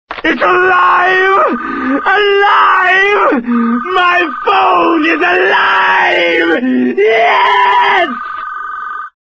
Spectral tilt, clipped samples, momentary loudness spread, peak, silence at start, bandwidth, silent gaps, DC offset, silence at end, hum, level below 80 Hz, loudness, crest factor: -4 dB/octave; under 0.1%; 9 LU; 0 dBFS; 0.1 s; 7.8 kHz; none; under 0.1%; 0.25 s; none; -50 dBFS; -9 LUFS; 10 dB